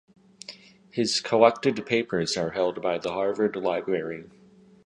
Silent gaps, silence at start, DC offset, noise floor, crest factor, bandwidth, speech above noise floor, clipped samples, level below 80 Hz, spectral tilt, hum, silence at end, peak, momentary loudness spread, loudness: none; 0.5 s; under 0.1%; -47 dBFS; 24 dB; 11.5 kHz; 22 dB; under 0.1%; -64 dBFS; -4 dB/octave; none; 0.6 s; -2 dBFS; 20 LU; -25 LUFS